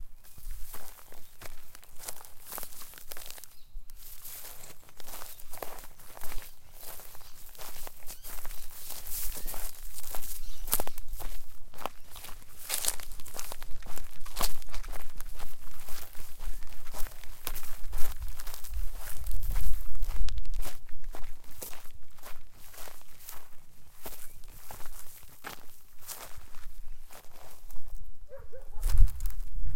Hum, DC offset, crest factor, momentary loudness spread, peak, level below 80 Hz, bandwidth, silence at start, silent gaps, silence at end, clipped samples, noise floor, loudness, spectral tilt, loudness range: none; under 0.1%; 22 dB; 16 LU; -2 dBFS; -38 dBFS; 17 kHz; 0 s; none; 0 s; under 0.1%; -43 dBFS; -41 LUFS; -2.5 dB/octave; 10 LU